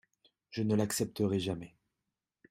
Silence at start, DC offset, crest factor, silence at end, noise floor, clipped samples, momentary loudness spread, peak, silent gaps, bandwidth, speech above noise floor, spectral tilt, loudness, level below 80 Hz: 0.5 s; under 0.1%; 18 dB; 0.85 s; -88 dBFS; under 0.1%; 12 LU; -18 dBFS; none; 16 kHz; 56 dB; -5.5 dB/octave; -34 LUFS; -68 dBFS